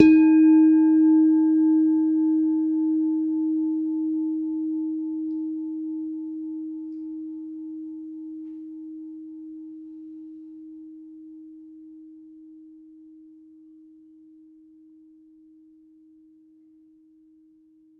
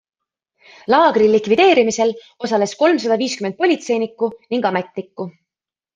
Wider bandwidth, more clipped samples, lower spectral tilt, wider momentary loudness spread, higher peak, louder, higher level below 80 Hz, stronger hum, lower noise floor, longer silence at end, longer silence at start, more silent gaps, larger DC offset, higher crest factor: second, 2.6 kHz vs 9.6 kHz; neither; first, -8 dB/octave vs -4.5 dB/octave; first, 26 LU vs 16 LU; about the same, 0 dBFS vs -2 dBFS; second, -22 LUFS vs -17 LUFS; about the same, -68 dBFS vs -64 dBFS; neither; second, -57 dBFS vs -89 dBFS; first, 5.45 s vs 0.65 s; second, 0 s vs 0.9 s; neither; neither; first, 24 dB vs 16 dB